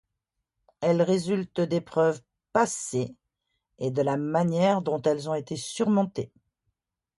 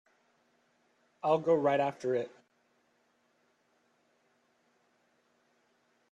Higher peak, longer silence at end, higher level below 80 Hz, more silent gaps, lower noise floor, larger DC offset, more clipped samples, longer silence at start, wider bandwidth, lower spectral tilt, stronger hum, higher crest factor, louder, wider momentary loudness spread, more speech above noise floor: first, -8 dBFS vs -14 dBFS; second, 0.95 s vs 3.85 s; first, -68 dBFS vs -84 dBFS; neither; first, -83 dBFS vs -73 dBFS; neither; neither; second, 0.8 s vs 1.25 s; first, 11.5 kHz vs 9.6 kHz; about the same, -6 dB/octave vs -7 dB/octave; neither; about the same, 18 dB vs 22 dB; first, -27 LUFS vs -30 LUFS; about the same, 10 LU vs 9 LU; first, 58 dB vs 44 dB